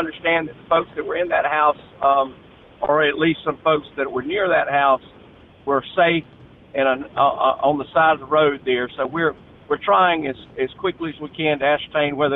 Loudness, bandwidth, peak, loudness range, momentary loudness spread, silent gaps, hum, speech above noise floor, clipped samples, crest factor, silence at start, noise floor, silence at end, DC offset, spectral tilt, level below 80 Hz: -20 LUFS; 4.1 kHz; -6 dBFS; 2 LU; 8 LU; none; none; 27 dB; under 0.1%; 14 dB; 0 s; -47 dBFS; 0 s; under 0.1%; -8.5 dB/octave; -56 dBFS